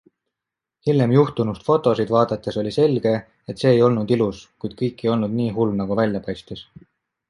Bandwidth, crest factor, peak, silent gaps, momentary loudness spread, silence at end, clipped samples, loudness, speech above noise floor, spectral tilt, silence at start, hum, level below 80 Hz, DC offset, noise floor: 11 kHz; 18 dB; -2 dBFS; none; 14 LU; 0.65 s; under 0.1%; -20 LUFS; 66 dB; -8 dB/octave; 0.85 s; none; -54 dBFS; under 0.1%; -86 dBFS